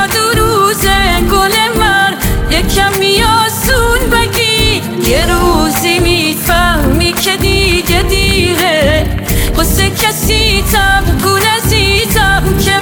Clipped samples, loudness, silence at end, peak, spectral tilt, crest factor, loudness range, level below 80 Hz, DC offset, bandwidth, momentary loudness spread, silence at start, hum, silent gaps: under 0.1%; -10 LUFS; 0 s; 0 dBFS; -3.5 dB/octave; 10 dB; 1 LU; -18 dBFS; under 0.1%; over 20 kHz; 2 LU; 0 s; none; none